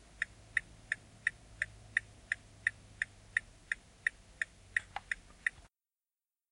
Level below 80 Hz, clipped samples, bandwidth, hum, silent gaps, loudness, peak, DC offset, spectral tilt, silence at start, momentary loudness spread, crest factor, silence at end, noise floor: -62 dBFS; under 0.1%; 11.5 kHz; none; none; -39 LUFS; -14 dBFS; under 0.1%; -1.5 dB/octave; 0.2 s; 5 LU; 28 dB; 1 s; under -90 dBFS